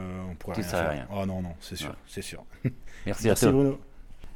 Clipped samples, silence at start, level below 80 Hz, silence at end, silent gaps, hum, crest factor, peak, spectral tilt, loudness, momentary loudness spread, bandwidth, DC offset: under 0.1%; 0 s; -44 dBFS; 0 s; none; none; 22 dB; -8 dBFS; -5.5 dB/octave; -29 LUFS; 16 LU; 19 kHz; under 0.1%